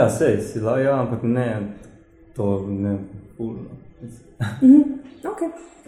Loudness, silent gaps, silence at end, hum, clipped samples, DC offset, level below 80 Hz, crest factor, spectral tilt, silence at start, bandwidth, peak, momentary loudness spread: -21 LUFS; none; 0.2 s; none; under 0.1%; under 0.1%; -52 dBFS; 18 dB; -8 dB/octave; 0 s; 12.5 kHz; -2 dBFS; 24 LU